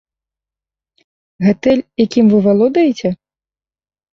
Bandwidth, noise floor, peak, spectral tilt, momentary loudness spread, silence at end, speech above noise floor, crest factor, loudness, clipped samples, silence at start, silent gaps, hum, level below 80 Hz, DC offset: 7.2 kHz; under -90 dBFS; -2 dBFS; -7.5 dB/octave; 10 LU; 1 s; over 78 dB; 14 dB; -13 LUFS; under 0.1%; 1.4 s; none; none; -52 dBFS; under 0.1%